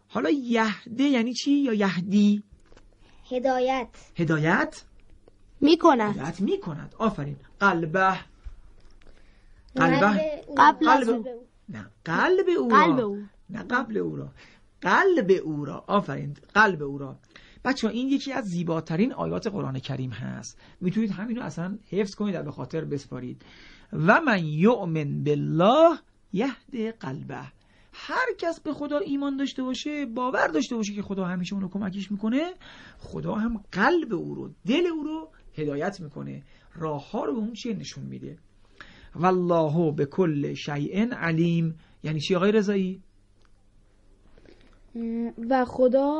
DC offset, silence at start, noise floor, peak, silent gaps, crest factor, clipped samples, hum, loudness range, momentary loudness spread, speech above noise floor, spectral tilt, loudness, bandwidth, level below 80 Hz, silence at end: under 0.1%; 0.1 s; -58 dBFS; -4 dBFS; none; 22 dB; under 0.1%; none; 8 LU; 17 LU; 33 dB; -6.5 dB/octave; -25 LUFS; 9.4 kHz; -56 dBFS; 0 s